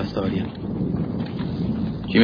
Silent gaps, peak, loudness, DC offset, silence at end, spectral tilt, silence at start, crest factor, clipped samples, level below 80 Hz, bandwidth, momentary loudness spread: none; -4 dBFS; -26 LUFS; under 0.1%; 0 s; -9 dB/octave; 0 s; 18 dB; under 0.1%; -42 dBFS; 5.2 kHz; 3 LU